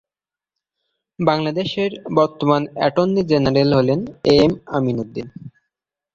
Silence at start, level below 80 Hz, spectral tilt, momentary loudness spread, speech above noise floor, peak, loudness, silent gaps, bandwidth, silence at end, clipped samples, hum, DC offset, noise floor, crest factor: 1.2 s; -48 dBFS; -7.5 dB/octave; 8 LU; over 72 dB; -2 dBFS; -18 LUFS; none; 7.6 kHz; 0.65 s; under 0.1%; none; under 0.1%; under -90 dBFS; 18 dB